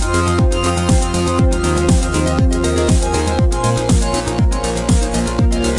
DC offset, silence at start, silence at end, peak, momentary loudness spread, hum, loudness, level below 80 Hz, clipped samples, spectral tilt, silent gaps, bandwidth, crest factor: under 0.1%; 0 s; 0 s; -2 dBFS; 2 LU; none; -16 LUFS; -20 dBFS; under 0.1%; -5.5 dB/octave; none; 11.5 kHz; 12 dB